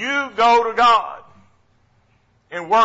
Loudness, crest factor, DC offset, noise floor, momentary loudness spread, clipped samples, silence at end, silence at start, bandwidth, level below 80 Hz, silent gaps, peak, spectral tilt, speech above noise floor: -16 LUFS; 12 dB; under 0.1%; -60 dBFS; 18 LU; under 0.1%; 0 s; 0 s; 8 kHz; -56 dBFS; none; -6 dBFS; -2.5 dB/octave; 44 dB